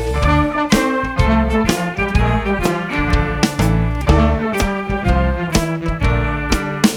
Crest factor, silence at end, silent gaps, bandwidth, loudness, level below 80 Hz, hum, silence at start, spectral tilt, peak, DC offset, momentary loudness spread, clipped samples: 16 dB; 0 s; none; 18 kHz; -17 LUFS; -22 dBFS; none; 0 s; -5.5 dB/octave; 0 dBFS; under 0.1%; 4 LU; under 0.1%